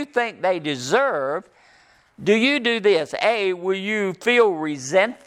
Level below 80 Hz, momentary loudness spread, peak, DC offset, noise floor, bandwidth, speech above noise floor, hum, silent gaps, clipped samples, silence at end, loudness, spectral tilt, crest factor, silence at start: -70 dBFS; 8 LU; -4 dBFS; under 0.1%; -55 dBFS; 12.5 kHz; 35 dB; none; none; under 0.1%; 0.1 s; -21 LUFS; -4 dB/octave; 16 dB; 0 s